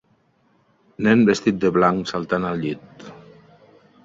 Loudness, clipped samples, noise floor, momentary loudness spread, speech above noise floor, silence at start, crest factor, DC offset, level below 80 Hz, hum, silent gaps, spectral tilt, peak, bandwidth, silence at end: -20 LUFS; under 0.1%; -62 dBFS; 23 LU; 43 dB; 1 s; 18 dB; under 0.1%; -56 dBFS; none; none; -6.5 dB/octave; -4 dBFS; 7.8 kHz; 0.85 s